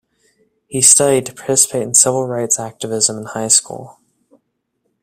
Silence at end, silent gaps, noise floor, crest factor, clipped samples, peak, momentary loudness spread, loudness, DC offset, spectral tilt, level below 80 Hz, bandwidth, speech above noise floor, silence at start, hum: 1.1 s; none; -70 dBFS; 18 dB; under 0.1%; 0 dBFS; 15 LU; -13 LUFS; under 0.1%; -2.5 dB/octave; -60 dBFS; over 20 kHz; 54 dB; 0.7 s; none